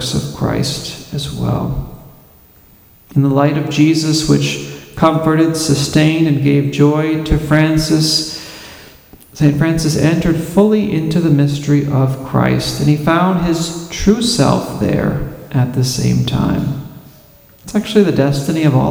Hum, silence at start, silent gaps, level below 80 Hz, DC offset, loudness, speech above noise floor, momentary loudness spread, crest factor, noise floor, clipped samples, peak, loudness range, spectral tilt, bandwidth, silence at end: none; 0 s; none; -34 dBFS; under 0.1%; -14 LUFS; 32 dB; 10 LU; 14 dB; -45 dBFS; under 0.1%; 0 dBFS; 4 LU; -6 dB/octave; 17 kHz; 0 s